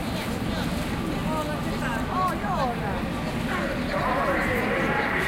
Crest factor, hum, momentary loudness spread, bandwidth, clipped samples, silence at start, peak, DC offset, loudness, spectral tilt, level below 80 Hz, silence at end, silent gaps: 14 dB; none; 5 LU; 16.5 kHz; under 0.1%; 0 s; -12 dBFS; under 0.1%; -26 LUFS; -5.5 dB/octave; -38 dBFS; 0 s; none